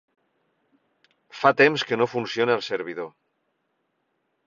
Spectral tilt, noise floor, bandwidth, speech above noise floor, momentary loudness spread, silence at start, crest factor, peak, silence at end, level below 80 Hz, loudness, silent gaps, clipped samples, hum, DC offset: -5 dB/octave; -74 dBFS; 7.4 kHz; 52 dB; 16 LU; 1.35 s; 24 dB; -4 dBFS; 1.4 s; -70 dBFS; -22 LUFS; none; under 0.1%; none; under 0.1%